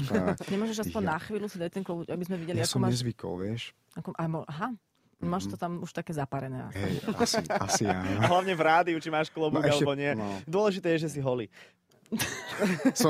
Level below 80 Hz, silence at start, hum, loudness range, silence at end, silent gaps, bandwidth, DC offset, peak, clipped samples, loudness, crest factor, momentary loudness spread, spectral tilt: -62 dBFS; 0 s; none; 8 LU; 0 s; none; 16 kHz; under 0.1%; -10 dBFS; under 0.1%; -30 LUFS; 20 dB; 10 LU; -5 dB/octave